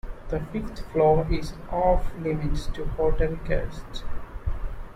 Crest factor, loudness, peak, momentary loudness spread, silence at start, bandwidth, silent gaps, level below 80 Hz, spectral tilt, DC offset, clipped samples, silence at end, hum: 16 dB; -27 LUFS; -8 dBFS; 16 LU; 0.05 s; 10.5 kHz; none; -30 dBFS; -7.5 dB/octave; under 0.1%; under 0.1%; 0 s; none